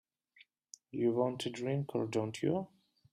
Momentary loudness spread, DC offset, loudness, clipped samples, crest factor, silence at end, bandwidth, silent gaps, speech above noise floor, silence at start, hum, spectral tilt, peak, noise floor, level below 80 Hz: 17 LU; under 0.1%; -36 LUFS; under 0.1%; 18 dB; 0.45 s; 14 kHz; none; 32 dB; 0.95 s; none; -6.5 dB/octave; -20 dBFS; -67 dBFS; -76 dBFS